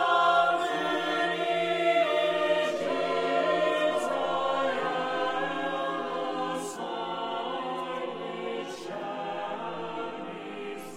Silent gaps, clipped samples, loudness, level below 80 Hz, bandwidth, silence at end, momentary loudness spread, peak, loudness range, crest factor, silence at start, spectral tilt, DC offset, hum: none; under 0.1%; -29 LUFS; -74 dBFS; 15.5 kHz; 0 s; 11 LU; -12 dBFS; 8 LU; 16 dB; 0 s; -4 dB/octave; under 0.1%; none